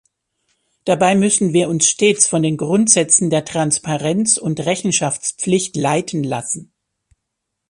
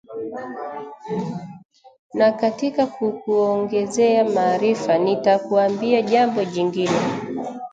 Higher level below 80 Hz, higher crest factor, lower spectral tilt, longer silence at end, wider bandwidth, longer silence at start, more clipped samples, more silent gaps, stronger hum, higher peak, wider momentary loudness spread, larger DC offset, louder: first, -58 dBFS vs -66 dBFS; about the same, 18 dB vs 16 dB; second, -3.5 dB/octave vs -5.5 dB/octave; first, 1.05 s vs 0.05 s; first, 11.5 kHz vs 9.2 kHz; first, 0.85 s vs 0.1 s; neither; second, none vs 1.65-1.69 s, 1.99-2.10 s; neither; first, 0 dBFS vs -6 dBFS; second, 9 LU vs 13 LU; neither; first, -16 LUFS vs -20 LUFS